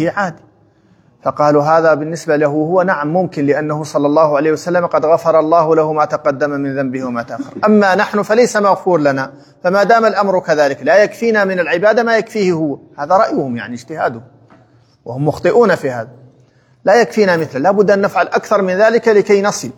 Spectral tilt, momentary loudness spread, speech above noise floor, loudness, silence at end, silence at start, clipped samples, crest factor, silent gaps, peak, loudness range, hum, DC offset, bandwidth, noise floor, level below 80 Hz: -6 dB/octave; 10 LU; 38 dB; -13 LUFS; 0.05 s; 0 s; under 0.1%; 14 dB; none; 0 dBFS; 4 LU; none; under 0.1%; 14 kHz; -51 dBFS; -60 dBFS